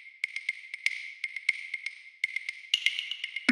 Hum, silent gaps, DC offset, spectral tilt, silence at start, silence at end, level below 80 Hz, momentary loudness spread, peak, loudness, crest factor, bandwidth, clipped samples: none; none; under 0.1%; 0 dB/octave; 0 s; 0 s; under -90 dBFS; 9 LU; -6 dBFS; -32 LUFS; 26 dB; 16 kHz; under 0.1%